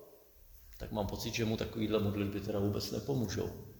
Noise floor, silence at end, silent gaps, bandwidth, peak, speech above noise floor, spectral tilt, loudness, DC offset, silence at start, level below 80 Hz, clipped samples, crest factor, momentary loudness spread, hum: -59 dBFS; 0 s; none; over 20 kHz; -18 dBFS; 23 dB; -6 dB/octave; -36 LUFS; under 0.1%; 0 s; -54 dBFS; under 0.1%; 20 dB; 6 LU; none